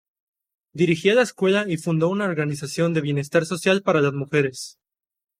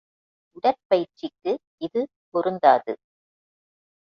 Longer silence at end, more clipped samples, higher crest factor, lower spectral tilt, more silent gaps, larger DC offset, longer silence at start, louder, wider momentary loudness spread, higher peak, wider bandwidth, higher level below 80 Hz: second, 0.7 s vs 1.2 s; neither; about the same, 18 dB vs 22 dB; second, -5.5 dB/octave vs -7 dB/octave; second, none vs 0.85-0.90 s, 1.67-1.78 s, 2.16-2.32 s; neither; about the same, 0.75 s vs 0.65 s; first, -21 LUFS vs -24 LUFS; second, 7 LU vs 14 LU; about the same, -4 dBFS vs -4 dBFS; first, 15.5 kHz vs 6.6 kHz; first, -66 dBFS vs -72 dBFS